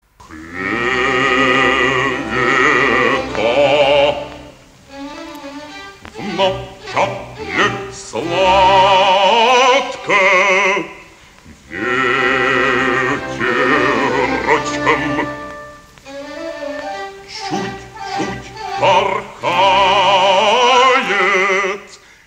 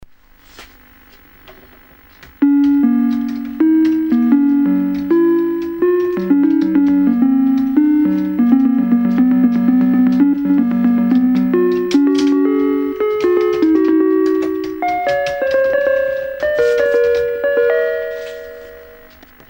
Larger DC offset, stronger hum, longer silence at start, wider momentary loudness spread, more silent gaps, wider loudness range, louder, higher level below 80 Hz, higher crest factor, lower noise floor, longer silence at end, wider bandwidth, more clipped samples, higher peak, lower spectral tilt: neither; neither; second, 0.2 s vs 0.6 s; first, 19 LU vs 6 LU; neither; first, 10 LU vs 3 LU; about the same, -14 LUFS vs -14 LUFS; first, -44 dBFS vs -50 dBFS; about the same, 16 dB vs 14 dB; about the same, -42 dBFS vs -45 dBFS; second, 0.3 s vs 0.6 s; about the same, 15.5 kHz vs 16.5 kHz; neither; about the same, 0 dBFS vs 0 dBFS; second, -3.5 dB/octave vs -7.5 dB/octave